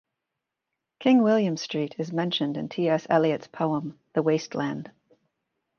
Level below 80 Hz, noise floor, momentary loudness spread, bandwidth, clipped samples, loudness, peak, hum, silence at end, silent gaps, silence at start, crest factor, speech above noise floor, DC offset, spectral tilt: -74 dBFS; -85 dBFS; 10 LU; 7 kHz; under 0.1%; -25 LUFS; -8 dBFS; none; 0.9 s; none; 1 s; 20 dB; 60 dB; under 0.1%; -6 dB/octave